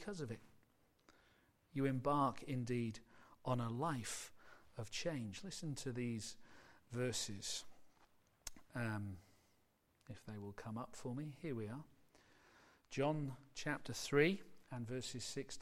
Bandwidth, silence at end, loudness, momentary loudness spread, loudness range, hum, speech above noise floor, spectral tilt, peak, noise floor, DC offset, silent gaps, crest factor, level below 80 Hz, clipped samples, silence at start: 16 kHz; 0 s; -43 LUFS; 17 LU; 9 LU; none; 35 dB; -5 dB/octave; -20 dBFS; -78 dBFS; under 0.1%; none; 26 dB; -68 dBFS; under 0.1%; 0 s